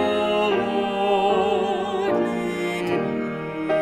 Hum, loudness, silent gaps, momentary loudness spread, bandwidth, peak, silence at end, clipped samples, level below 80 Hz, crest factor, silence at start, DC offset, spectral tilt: none; -23 LUFS; none; 6 LU; 13.5 kHz; -8 dBFS; 0 s; under 0.1%; -56 dBFS; 14 dB; 0 s; under 0.1%; -5.5 dB/octave